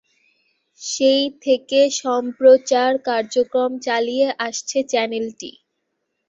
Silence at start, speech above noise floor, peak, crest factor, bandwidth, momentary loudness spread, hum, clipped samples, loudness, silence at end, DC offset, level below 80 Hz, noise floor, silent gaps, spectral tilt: 0.8 s; 56 dB; -2 dBFS; 18 dB; 7.8 kHz; 13 LU; none; under 0.1%; -18 LUFS; 0.8 s; under 0.1%; -70 dBFS; -75 dBFS; none; -2 dB/octave